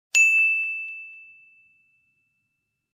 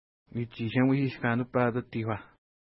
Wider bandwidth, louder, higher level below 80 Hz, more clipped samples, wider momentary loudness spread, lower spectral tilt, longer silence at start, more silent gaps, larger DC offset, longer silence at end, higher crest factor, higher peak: first, 15 kHz vs 5.8 kHz; first, -18 LUFS vs -29 LUFS; second, -86 dBFS vs -64 dBFS; neither; first, 22 LU vs 12 LU; second, 5 dB/octave vs -11.5 dB/octave; second, 0.15 s vs 0.35 s; neither; neither; first, 1.75 s vs 0.5 s; about the same, 20 dB vs 18 dB; first, -6 dBFS vs -12 dBFS